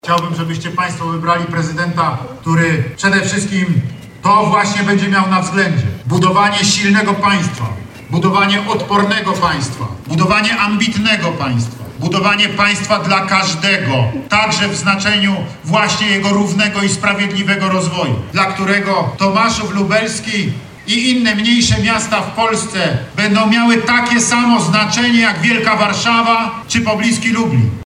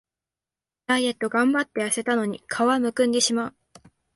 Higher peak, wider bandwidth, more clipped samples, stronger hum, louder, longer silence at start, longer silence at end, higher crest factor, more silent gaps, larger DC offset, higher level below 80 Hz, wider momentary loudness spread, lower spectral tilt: first, 0 dBFS vs -8 dBFS; first, 13.5 kHz vs 12 kHz; neither; neither; first, -13 LUFS vs -23 LUFS; second, 0.05 s vs 0.9 s; second, 0 s vs 0.65 s; about the same, 14 dB vs 16 dB; neither; neither; first, -44 dBFS vs -66 dBFS; about the same, 7 LU vs 7 LU; first, -4 dB/octave vs -2.5 dB/octave